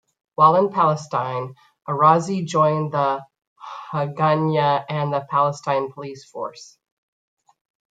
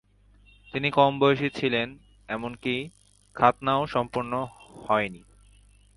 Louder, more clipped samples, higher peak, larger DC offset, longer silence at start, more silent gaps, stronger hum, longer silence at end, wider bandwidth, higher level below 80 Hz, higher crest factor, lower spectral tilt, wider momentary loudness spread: first, -20 LUFS vs -26 LUFS; neither; about the same, -2 dBFS vs -4 dBFS; neither; second, 0.4 s vs 0.75 s; first, 3.47-3.56 s vs none; second, none vs 50 Hz at -55 dBFS; first, 1.3 s vs 0.8 s; second, 9.2 kHz vs 11.5 kHz; second, -68 dBFS vs -58 dBFS; about the same, 20 dB vs 24 dB; about the same, -6.5 dB/octave vs -6.5 dB/octave; first, 18 LU vs 14 LU